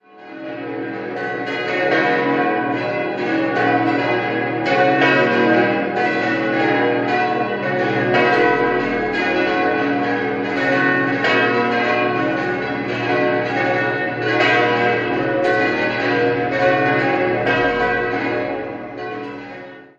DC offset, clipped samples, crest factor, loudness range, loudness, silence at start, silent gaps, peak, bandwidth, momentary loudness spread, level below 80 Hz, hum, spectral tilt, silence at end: under 0.1%; under 0.1%; 18 dB; 2 LU; -18 LUFS; 0.15 s; none; 0 dBFS; 7.8 kHz; 11 LU; -52 dBFS; 60 Hz at -45 dBFS; -6.5 dB/octave; 0.15 s